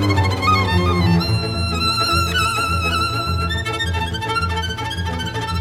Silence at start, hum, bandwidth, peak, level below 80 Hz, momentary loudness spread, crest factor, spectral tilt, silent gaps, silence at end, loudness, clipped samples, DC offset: 0 s; none; 16 kHz; -4 dBFS; -32 dBFS; 7 LU; 14 dB; -5 dB/octave; none; 0 s; -19 LUFS; under 0.1%; under 0.1%